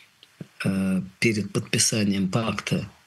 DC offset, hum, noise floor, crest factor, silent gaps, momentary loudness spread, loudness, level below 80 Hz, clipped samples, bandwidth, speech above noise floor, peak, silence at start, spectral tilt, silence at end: under 0.1%; none; -46 dBFS; 20 dB; none; 7 LU; -24 LUFS; -60 dBFS; under 0.1%; 12.5 kHz; 21 dB; -4 dBFS; 0.4 s; -4 dB/octave; 0.15 s